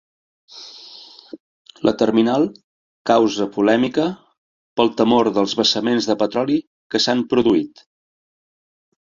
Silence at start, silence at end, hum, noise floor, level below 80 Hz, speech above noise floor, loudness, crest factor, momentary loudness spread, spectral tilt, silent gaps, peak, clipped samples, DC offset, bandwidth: 0.55 s; 1.55 s; none; -42 dBFS; -58 dBFS; 25 dB; -18 LUFS; 18 dB; 20 LU; -4.5 dB/octave; 1.40-1.65 s, 2.64-3.05 s, 4.38-4.76 s, 6.67-6.90 s; -2 dBFS; under 0.1%; under 0.1%; 7.6 kHz